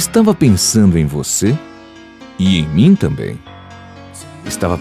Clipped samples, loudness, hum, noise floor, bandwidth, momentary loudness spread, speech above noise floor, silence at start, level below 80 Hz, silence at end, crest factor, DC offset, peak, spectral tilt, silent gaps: under 0.1%; -13 LUFS; none; -37 dBFS; 16 kHz; 21 LU; 25 dB; 0 s; -32 dBFS; 0 s; 14 dB; under 0.1%; -2 dBFS; -5 dB/octave; none